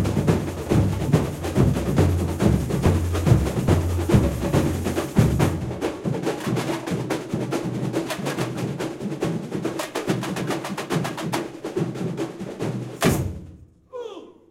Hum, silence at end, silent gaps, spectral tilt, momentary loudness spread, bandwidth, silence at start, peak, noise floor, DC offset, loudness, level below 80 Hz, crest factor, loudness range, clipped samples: none; 0.2 s; none; -6.5 dB/octave; 9 LU; 16.5 kHz; 0 s; -4 dBFS; -45 dBFS; under 0.1%; -24 LUFS; -36 dBFS; 18 dB; 6 LU; under 0.1%